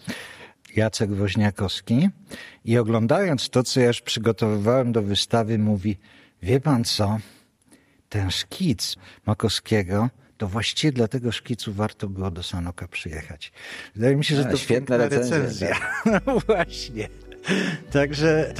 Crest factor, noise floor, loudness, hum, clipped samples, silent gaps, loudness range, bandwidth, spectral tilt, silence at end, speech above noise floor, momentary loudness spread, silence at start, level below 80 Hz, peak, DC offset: 18 dB; -57 dBFS; -23 LUFS; none; under 0.1%; none; 4 LU; 14.5 kHz; -5.5 dB/octave; 0 s; 35 dB; 13 LU; 0.05 s; -48 dBFS; -6 dBFS; under 0.1%